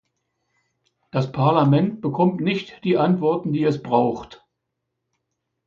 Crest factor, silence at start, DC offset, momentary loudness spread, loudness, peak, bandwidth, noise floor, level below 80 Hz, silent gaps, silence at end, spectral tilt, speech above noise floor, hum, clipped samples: 20 dB; 1.15 s; under 0.1%; 8 LU; -21 LUFS; -2 dBFS; 7 kHz; -79 dBFS; -60 dBFS; none; 1.3 s; -8.5 dB/octave; 59 dB; none; under 0.1%